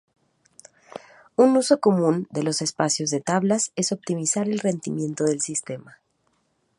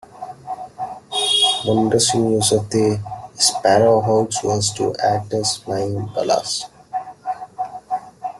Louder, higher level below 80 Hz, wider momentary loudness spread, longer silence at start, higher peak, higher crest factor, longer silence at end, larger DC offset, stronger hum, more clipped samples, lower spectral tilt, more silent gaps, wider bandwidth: second, -23 LUFS vs -18 LUFS; second, -70 dBFS vs -54 dBFS; about the same, 17 LU vs 15 LU; first, 0.95 s vs 0.15 s; about the same, -4 dBFS vs -2 dBFS; about the same, 20 dB vs 18 dB; first, 0.9 s vs 0 s; neither; neither; neither; about the same, -4.5 dB/octave vs -3.5 dB/octave; neither; about the same, 11.5 kHz vs 12.5 kHz